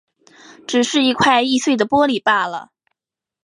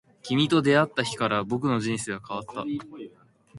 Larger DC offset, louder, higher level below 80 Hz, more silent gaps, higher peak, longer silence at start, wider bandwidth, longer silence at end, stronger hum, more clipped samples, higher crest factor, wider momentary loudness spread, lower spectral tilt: neither; first, -16 LUFS vs -26 LUFS; about the same, -58 dBFS vs -62 dBFS; neither; first, -2 dBFS vs -6 dBFS; first, 0.7 s vs 0.25 s; about the same, 11.5 kHz vs 11.5 kHz; first, 0.8 s vs 0 s; neither; neither; about the same, 16 dB vs 20 dB; second, 10 LU vs 14 LU; second, -3 dB/octave vs -5 dB/octave